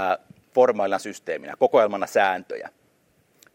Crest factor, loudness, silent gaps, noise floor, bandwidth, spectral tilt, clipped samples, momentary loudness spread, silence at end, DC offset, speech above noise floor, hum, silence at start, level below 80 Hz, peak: 18 dB; -23 LUFS; none; -64 dBFS; 16.5 kHz; -4 dB/octave; under 0.1%; 14 LU; 0.85 s; under 0.1%; 42 dB; none; 0 s; -76 dBFS; -4 dBFS